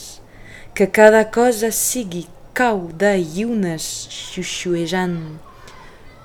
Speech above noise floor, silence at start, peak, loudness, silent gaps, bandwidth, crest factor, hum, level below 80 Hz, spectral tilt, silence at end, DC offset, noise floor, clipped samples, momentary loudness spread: 23 dB; 0 s; 0 dBFS; -18 LUFS; none; 20 kHz; 20 dB; none; -46 dBFS; -4 dB/octave; 0.15 s; under 0.1%; -40 dBFS; under 0.1%; 17 LU